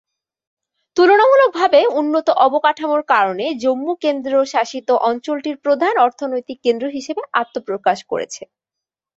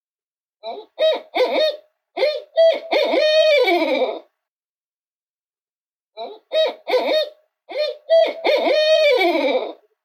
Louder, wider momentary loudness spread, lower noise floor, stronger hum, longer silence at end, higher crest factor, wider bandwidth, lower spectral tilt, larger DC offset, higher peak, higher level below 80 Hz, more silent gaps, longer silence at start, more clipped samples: about the same, -17 LUFS vs -18 LUFS; second, 11 LU vs 19 LU; second, -85 dBFS vs under -90 dBFS; neither; first, 0.7 s vs 0.3 s; about the same, 16 dB vs 14 dB; second, 8 kHz vs 15 kHz; first, -3.5 dB/octave vs -1.5 dB/octave; neither; first, -2 dBFS vs -6 dBFS; first, -68 dBFS vs under -90 dBFS; second, none vs 4.48-5.37 s, 5.45-5.49 s, 5.61-5.67 s, 5.75-5.81 s, 5.96-6.11 s; first, 0.95 s vs 0.65 s; neither